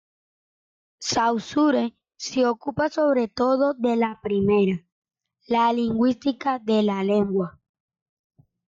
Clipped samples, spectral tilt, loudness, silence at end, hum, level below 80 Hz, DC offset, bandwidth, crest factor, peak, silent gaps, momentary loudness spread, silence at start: under 0.1%; -5.5 dB/octave; -23 LUFS; 1.2 s; none; -60 dBFS; under 0.1%; 7.8 kHz; 12 dB; -10 dBFS; 4.92-5.02 s; 6 LU; 1 s